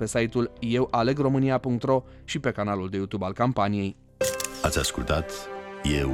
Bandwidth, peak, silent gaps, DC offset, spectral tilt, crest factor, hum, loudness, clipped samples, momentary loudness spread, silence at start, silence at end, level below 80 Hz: 16.5 kHz; -10 dBFS; none; under 0.1%; -5 dB/octave; 16 dB; none; -27 LUFS; under 0.1%; 7 LU; 0 s; 0 s; -42 dBFS